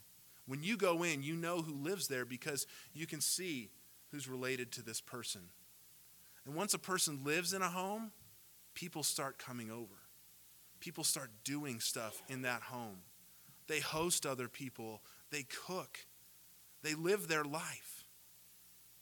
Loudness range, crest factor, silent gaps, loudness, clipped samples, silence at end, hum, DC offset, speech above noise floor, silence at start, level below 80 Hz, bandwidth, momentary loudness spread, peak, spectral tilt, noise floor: 4 LU; 24 dB; none; -40 LUFS; under 0.1%; 0 s; 60 Hz at -75 dBFS; under 0.1%; 22 dB; 0 s; -80 dBFS; 19 kHz; 23 LU; -20 dBFS; -2.5 dB/octave; -63 dBFS